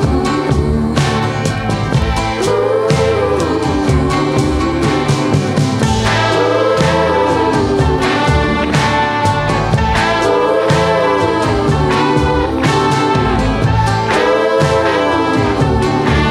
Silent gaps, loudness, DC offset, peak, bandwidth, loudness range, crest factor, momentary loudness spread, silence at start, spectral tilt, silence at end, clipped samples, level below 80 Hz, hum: none; -13 LUFS; under 0.1%; 0 dBFS; 13.5 kHz; 2 LU; 12 dB; 3 LU; 0 s; -6 dB/octave; 0 s; under 0.1%; -26 dBFS; none